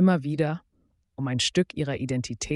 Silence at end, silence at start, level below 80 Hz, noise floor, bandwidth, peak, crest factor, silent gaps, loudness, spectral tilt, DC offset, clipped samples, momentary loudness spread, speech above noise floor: 0 s; 0 s; -54 dBFS; -69 dBFS; 11.5 kHz; -10 dBFS; 16 dB; none; -27 LUFS; -5 dB/octave; under 0.1%; under 0.1%; 11 LU; 43 dB